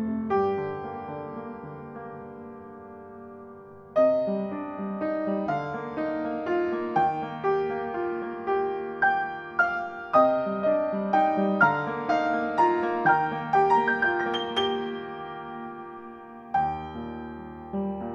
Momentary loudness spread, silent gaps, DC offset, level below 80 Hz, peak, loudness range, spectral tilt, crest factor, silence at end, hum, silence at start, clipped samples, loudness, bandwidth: 19 LU; none; under 0.1%; -60 dBFS; -8 dBFS; 9 LU; -6.5 dB/octave; 20 dB; 0 s; none; 0 s; under 0.1%; -26 LUFS; 7.8 kHz